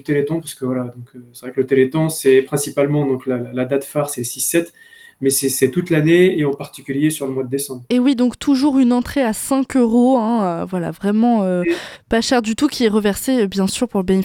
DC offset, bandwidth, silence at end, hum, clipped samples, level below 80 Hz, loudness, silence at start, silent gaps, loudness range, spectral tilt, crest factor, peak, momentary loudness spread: under 0.1%; 17.5 kHz; 0 s; none; under 0.1%; -48 dBFS; -17 LUFS; 0.05 s; none; 2 LU; -5 dB/octave; 16 dB; -2 dBFS; 9 LU